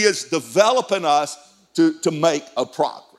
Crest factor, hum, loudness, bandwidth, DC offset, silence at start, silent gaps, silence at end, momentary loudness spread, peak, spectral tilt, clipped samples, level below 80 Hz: 20 dB; none; -20 LUFS; 13.5 kHz; under 0.1%; 0 s; none; 0.2 s; 10 LU; 0 dBFS; -3.5 dB/octave; under 0.1%; -74 dBFS